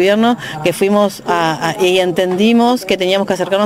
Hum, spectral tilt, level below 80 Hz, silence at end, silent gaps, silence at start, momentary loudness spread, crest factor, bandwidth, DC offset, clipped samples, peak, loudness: none; -5 dB/octave; -52 dBFS; 0 s; none; 0 s; 4 LU; 12 dB; 16.5 kHz; under 0.1%; under 0.1%; -2 dBFS; -14 LUFS